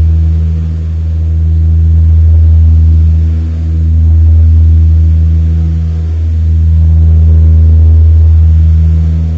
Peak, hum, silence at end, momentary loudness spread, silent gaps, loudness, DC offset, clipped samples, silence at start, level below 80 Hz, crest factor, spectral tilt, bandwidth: 0 dBFS; none; 0 s; 7 LU; none; -8 LUFS; under 0.1%; under 0.1%; 0 s; -8 dBFS; 6 dB; -10.5 dB/octave; 1.5 kHz